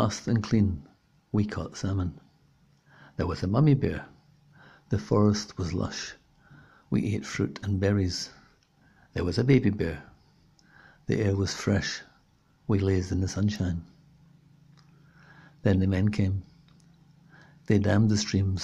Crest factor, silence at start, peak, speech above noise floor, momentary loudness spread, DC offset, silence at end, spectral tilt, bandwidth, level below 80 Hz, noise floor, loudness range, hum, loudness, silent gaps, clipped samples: 20 dB; 0 s; -8 dBFS; 38 dB; 13 LU; under 0.1%; 0 s; -6.5 dB/octave; 10.5 kHz; -54 dBFS; -63 dBFS; 3 LU; none; -27 LUFS; none; under 0.1%